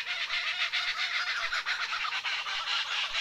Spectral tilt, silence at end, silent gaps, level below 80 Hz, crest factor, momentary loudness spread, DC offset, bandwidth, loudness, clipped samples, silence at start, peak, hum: 2.5 dB/octave; 0 s; none; -64 dBFS; 16 dB; 2 LU; under 0.1%; 16 kHz; -30 LUFS; under 0.1%; 0 s; -16 dBFS; none